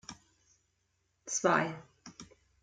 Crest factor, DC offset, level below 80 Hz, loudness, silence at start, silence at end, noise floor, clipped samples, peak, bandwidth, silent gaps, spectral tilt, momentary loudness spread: 24 dB; under 0.1%; -74 dBFS; -31 LUFS; 0.1 s; 0.4 s; -78 dBFS; under 0.1%; -12 dBFS; 10 kHz; none; -3.5 dB/octave; 24 LU